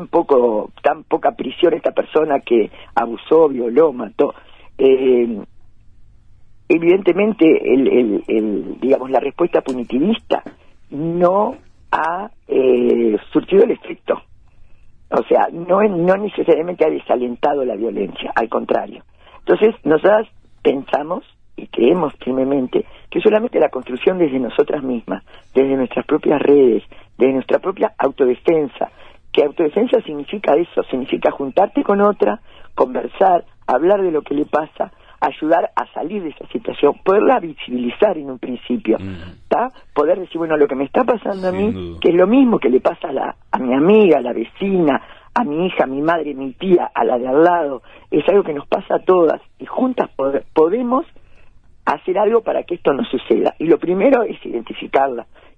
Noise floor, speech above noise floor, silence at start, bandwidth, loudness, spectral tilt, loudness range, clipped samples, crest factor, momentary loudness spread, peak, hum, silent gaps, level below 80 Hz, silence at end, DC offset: -43 dBFS; 27 dB; 0 s; 5.4 kHz; -17 LUFS; -8 dB/octave; 3 LU; under 0.1%; 16 dB; 10 LU; -2 dBFS; none; none; -50 dBFS; 0.35 s; under 0.1%